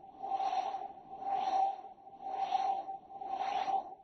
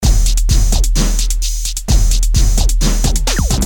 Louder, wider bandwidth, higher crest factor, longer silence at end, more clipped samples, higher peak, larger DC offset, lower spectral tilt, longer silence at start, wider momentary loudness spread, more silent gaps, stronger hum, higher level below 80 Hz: second, -36 LUFS vs -15 LUFS; second, 6.4 kHz vs 18 kHz; about the same, 14 dB vs 10 dB; about the same, 0 s vs 0 s; neither; second, -22 dBFS vs -2 dBFS; neither; second, -0.5 dB/octave vs -3.5 dB/octave; about the same, 0 s vs 0 s; first, 12 LU vs 4 LU; neither; neither; second, -78 dBFS vs -12 dBFS